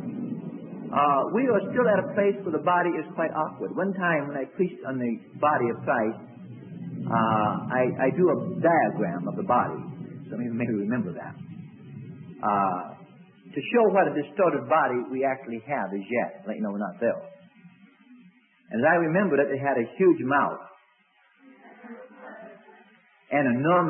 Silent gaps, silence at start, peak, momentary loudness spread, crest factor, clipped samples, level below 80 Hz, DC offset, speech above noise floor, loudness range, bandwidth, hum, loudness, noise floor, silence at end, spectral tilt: none; 0 s; -8 dBFS; 19 LU; 18 dB; under 0.1%; -72 dBFS; under 0.1%; 38 dB; 6 LU; 3.4 kHz; none; -25 LUFS; -63 dBFS; 0 s; -11.5 dB/octave